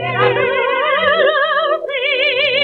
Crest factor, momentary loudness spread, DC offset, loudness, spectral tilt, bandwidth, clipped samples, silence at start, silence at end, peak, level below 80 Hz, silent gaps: 14 dB; 4 LU; under 0.1%; -14 LUFS; -6 dB/octave; 5.6 kHz; under 0.1%; 0 s; 0 s; -2 dBFS; -58 dBFS; none